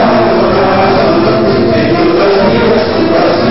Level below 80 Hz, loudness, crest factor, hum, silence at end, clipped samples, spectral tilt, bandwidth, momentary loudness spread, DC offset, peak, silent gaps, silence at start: -34 dBFS; -8 LUFS; 8 dB; none; 0 s; under 0.1%; -9.5 dB/octave; 5.8 kHz; 1 LU; 4%; 0 dBFS; none; 0 s